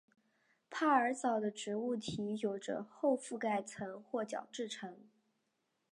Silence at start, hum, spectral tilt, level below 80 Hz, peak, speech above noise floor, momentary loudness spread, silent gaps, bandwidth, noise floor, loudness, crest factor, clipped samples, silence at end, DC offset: 0.7 s; none; -4.5 dB/octave; -78 dBFS; -18 dBFS; 46 dB; 13 LU; none; 11 kHz; -83 dBFS; -38 LUFS; 22 dB; under 0.1%; 0.9 s; under 0.1%